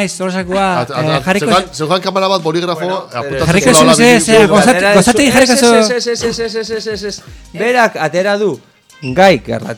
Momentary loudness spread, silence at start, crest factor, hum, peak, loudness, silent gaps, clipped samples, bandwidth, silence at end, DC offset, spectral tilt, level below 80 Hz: 12 LU; 0 s; 12 dB; none; 0 dBFS; -11 LUFS; none; 0.5%; over 20 kHz; 0 s; under 0.1%; -4 dB/octave; -40 dBFS